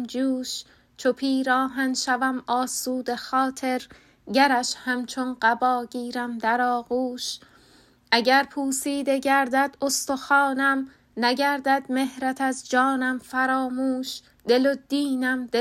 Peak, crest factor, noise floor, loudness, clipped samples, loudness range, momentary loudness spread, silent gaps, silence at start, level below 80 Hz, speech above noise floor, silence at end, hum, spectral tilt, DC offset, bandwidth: -4 dBFS; 20 dB; -56 dBFS; -24 LUFS; under 0.1%; 2 LU; 8 LU; none; 0 s; -66 dBFS; 33 dB; 0 s; none; -2 dB/octave; under 0.1%; 15 kHz